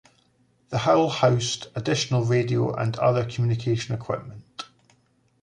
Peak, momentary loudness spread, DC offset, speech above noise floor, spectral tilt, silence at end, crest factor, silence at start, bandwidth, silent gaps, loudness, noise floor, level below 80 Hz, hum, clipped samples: -6 dBFS; 17 LU; under 0.1%; 41 dB; -5.5 dB/octave; 0.8 s; 18 dB; 0.7 s; 10.5 kHz; none; -24 LUFS; -64 dBFS; -56 dBFS; none; under 0.1%